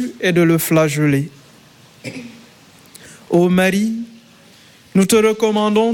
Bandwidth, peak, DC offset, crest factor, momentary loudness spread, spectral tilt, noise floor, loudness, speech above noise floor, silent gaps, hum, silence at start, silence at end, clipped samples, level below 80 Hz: 17.5 kHz; -2 dBFS; under 0.1%; 14 dB; 18 LU; -5.5 dB/octave; -46 dBFS; -15 LUFS; 32 dB; none; none; 0 s; 0 s; under 0.1%; -54 dBFS